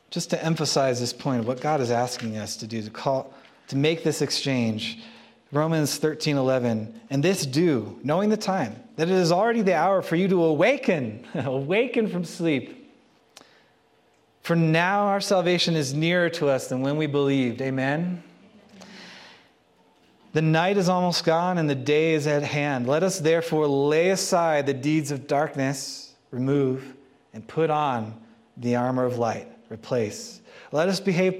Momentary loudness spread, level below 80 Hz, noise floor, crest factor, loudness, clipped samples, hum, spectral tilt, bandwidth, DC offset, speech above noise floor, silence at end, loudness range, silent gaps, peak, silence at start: 11 LU; -70 dBFS; -62 dBFS; 18 dB; -24 LUFS; under 0.1%; none; -5.5 dB/octave; 15.5 kHz; under 0.1%; 38 dB; 0 s; 5 LU; none; -6 dBFS; 0.1 s